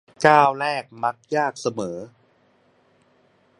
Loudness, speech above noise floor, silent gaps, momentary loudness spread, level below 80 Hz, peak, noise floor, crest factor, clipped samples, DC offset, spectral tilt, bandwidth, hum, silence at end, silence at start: -21 LUFS; 40 dB; none; 15 LU; -68 dBFS; 0 dBFS; -61 dBFS; 24 dB; under 0.1%; under 0.1%; -4.5 dB/octave; 11.5 kHz; none; 1.55 s; 0.2 s